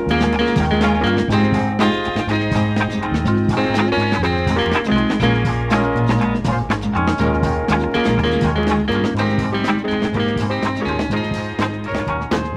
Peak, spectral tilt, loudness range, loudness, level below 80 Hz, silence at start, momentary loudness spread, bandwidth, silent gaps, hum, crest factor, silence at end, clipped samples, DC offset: -4 dBFS; -7 dB/octave; 2 LU; -18 LUFS; -32 dBFS; 0 s; 4 LU; 10.5 kHz; none; none; 14 dB; 0 s; under 0.1%; under 0.1%